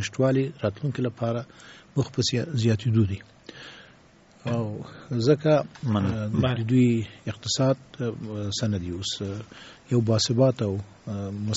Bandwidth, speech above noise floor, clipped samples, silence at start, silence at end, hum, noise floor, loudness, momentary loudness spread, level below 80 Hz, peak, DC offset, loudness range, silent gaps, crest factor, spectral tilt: 8 kHz; 29 dB; under 0.1%; 0 s; 0 s; none; -55 dBFS; -26 LUFS; 15 LU; -56 dBFS; -8 dBFS; under 0.1%; 4 LU; none; 18 dB; -6.5 dB/octave